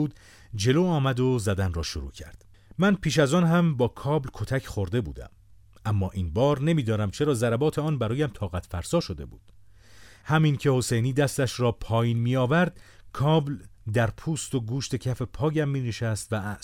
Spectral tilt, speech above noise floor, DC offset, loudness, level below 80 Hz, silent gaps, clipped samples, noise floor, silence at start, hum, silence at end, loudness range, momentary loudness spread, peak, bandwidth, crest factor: -6 dB/octave; 26 dB; under 0.1%; -26 LUFS; -46 dBFS; none; under 0.1%; -51 dBFS; 0 s; none; 0.05 s; 3 LU; 11 LU; -8 dBFS; 16 kHz; 18 dB